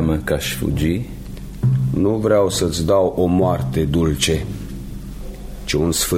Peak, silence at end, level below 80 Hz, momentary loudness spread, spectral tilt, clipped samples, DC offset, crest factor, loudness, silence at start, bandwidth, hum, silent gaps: -4 dBFS; 0 s; -32 dBFS; 17 LU; -5.5 dB/octave; under 0.1%; under 0.1%; 16 dB; -19 LUFS; 0 s; 16.5 kHz; none; none